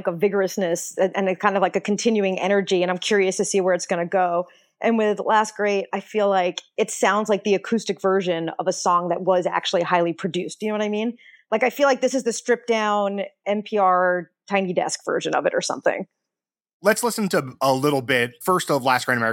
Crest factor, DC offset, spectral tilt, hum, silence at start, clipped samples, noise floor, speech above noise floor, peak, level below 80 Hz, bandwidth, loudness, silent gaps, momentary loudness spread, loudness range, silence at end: 20 dB; under 0.1%; -4 dB/octave; none; 0 s; under 0.1%; -88 dBFS; 67 dB; -2 dBFS; -74 dBFS; 17 kHz; -22 LUFS; 16.73-16.80 s; 6 LU; 2 LU; 0 s